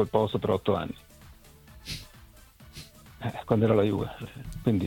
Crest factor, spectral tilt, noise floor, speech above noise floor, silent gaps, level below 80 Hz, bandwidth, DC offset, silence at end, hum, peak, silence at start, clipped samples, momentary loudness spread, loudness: 20 dB; -7.5 dB/octave; -53 dBFS; 26 dB; none; -50 dBFS; 18.5 kHz; under 0.1%; 0 s; none; -10 dBFS; 0 s; under 0.1%; 23 LU; -28 LUFS